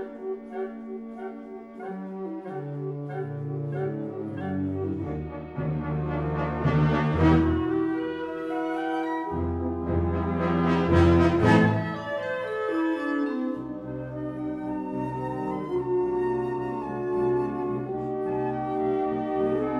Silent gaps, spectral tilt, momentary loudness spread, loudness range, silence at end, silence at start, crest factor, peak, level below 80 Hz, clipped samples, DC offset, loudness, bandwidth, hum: none; -8.5 dB/octave; 14 LU; 9 LU; 0 s; 0 s; 18 dB; -8 dBFS; -44 dBFS; under 0.1%; under 0.1%; -27 LUFS; 9.2 kHz; none